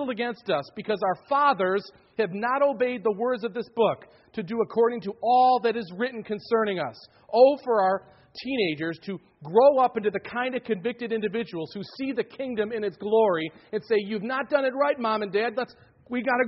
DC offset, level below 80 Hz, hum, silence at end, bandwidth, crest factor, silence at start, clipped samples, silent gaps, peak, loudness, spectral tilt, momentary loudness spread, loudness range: under 0.1%; -70 dBFS; none; 0 s; 5.8 kHz; 18 dB; 0 s; under 0.1%; none; -6 dBFS; -25 LUFS; -3.5 dB/octave; 14 LU; 4 LU